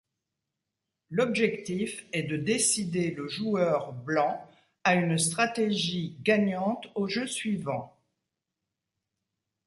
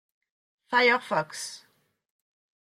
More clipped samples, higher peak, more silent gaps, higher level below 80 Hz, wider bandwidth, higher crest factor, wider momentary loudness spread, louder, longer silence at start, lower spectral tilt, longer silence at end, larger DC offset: neither; about the same, -10 dBFS vs -10 dBFS; neither; first, -70 dBFS vs -80 dBFS; second, 12 kHz vs 14 kHz; about the same, 20 dB vs 20 dB; second, 8 LU vs 15 LU; second, -28 LUFS vs -25 LUFS; first, 1.1 s vs 0.7 s; first, -4 dB/octave vs -2.5 dB/octave; first, 1.75 s vs 1.05 s; neither